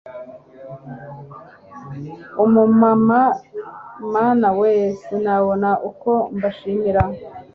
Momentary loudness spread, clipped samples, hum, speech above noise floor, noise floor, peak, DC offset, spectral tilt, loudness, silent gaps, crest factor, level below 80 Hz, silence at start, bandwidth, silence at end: 22 LU; under 0.1%; none; 24 dB; -41 dBFS; -2 dBFS; under 0.1%; -9.5 dB/octave; -17 LUFS; none; 16 dB; -44 dBFS; 0.05 s; 6.2 kHz; 0.1 s